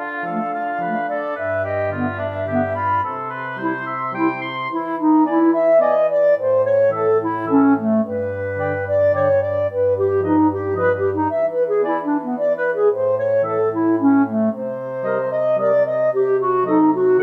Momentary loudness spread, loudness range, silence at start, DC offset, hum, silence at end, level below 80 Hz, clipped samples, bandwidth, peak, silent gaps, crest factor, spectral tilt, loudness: 8 LU; 5 LU; 0 s; under 0.1%; none; 0 s; -70 dBFS; under 0.1%; 5.6 kHz; -4 dBFS; none; 14 dB; -9.5 dB/octave; -19 LUFS